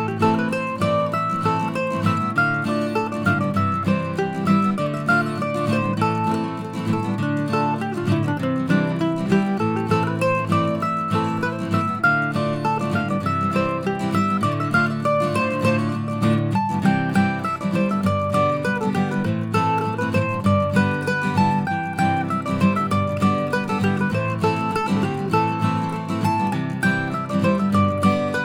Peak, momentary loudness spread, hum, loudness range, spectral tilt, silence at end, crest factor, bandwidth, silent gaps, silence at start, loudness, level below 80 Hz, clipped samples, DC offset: -4 dBFS; 4 LU; none; 1 LU; -7 dB/octave; 0 s; 16 dB; 15.5 kHz; none; 0 s; -21 LUFS; -56 dBFS; under 0.1%; under 0.1%